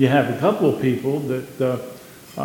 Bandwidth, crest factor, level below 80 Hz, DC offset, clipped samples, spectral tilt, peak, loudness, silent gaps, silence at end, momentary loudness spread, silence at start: 17.5 kHz; 18 dB; -62 dBFS; under 0.1%; under 0.1%; -7 dB/octave; -2 dBFS; -21 LUFS; none; 0 s; 18 LU; 0 s